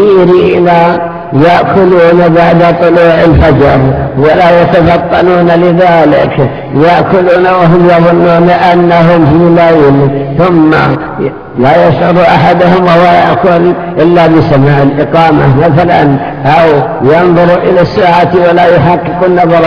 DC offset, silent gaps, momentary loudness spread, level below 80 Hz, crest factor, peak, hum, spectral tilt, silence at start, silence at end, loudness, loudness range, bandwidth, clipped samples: under 0.1%; none; 4 LU; -28 dBFS; 4 dB; 0 dBFS; none; -9 dB/octave; 0 s; 0 s; -5 LUFS; 1 LU; 5.4 kHz; 8%